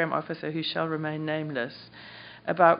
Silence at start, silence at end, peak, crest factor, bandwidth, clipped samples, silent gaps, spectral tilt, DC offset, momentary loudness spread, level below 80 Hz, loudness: 0 s; 0 s; -6 dBFS; 22 dB; 5.4 kHz; under 0.1%; none; -3.5 dB/octave; under 0.1%; 15 LU; -72 dBFS; -30 LUFS